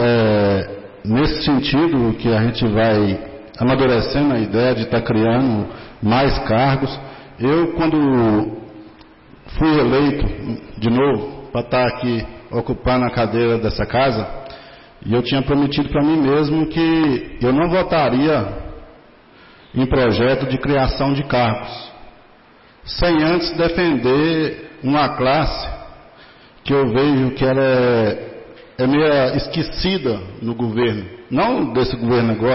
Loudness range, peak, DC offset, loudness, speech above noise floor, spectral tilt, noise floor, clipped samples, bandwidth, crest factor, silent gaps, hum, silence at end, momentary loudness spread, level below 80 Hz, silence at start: 3 LU; -8 dBFS; under 0.1%; -18 LUFS; 31 dB; -10.5 dB/octave; -48 dBFS; under 0.1%; 5.8 kHz; 10 dB; none; none; 0 s; 12 LU; -34 dBFS; 0 s